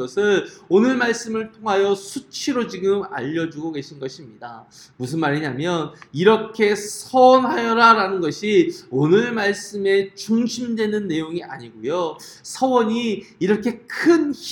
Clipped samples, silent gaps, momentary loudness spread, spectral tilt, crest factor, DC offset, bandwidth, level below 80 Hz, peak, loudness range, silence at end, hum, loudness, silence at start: under 0.1%; none; 15 LU; -5 dB/octave; 20 dB; under 0.1%; 17.5 kHz; -64 dBFS; 0 dBFS; 8 LU; 0 s; none; -20 LUFS; 0 s